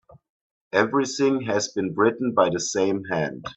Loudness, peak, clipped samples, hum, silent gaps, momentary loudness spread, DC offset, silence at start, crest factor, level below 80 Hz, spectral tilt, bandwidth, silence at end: -23 LUFS; -4 dBFS; under 0.1%; none; none; 5 LU; under 0.1%; 0.75 s; 20 dB; -64 dBFS; -4.5 dB/octave; 8.4 kHz; 0.05 s